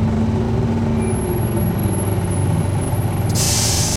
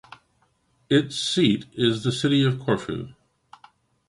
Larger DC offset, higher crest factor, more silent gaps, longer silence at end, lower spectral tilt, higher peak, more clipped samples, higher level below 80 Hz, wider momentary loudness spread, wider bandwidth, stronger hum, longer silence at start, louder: neither; about the same, 14 dB vs 18 dB; neither; second, 0 s vs 0.95 s; about the same, -5 dB/octave vs -5.5 dB/octave; about the same, -4 dBFS vs -6 dBFS; neither; first, -30 dBFS vs -58 dBFS; second, 5 LU vs 10 LU; first, 16 kHz vs 11.5 kHz; neither; second, 0 s vs 0.9 s; first, -18 LUFS vs -23 LUFS